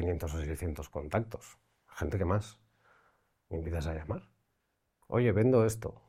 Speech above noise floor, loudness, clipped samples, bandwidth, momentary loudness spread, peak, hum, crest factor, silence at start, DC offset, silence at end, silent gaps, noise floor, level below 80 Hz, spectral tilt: 48 dB; -33 LUFS; under 0.1%; 16 kHz; 16 LU; -14 dBFS; none; 20 dB; 0 s; under 0.1%; 0.15 s; none; -80 dBFS; -50 dBFS; -7.5 dB/octave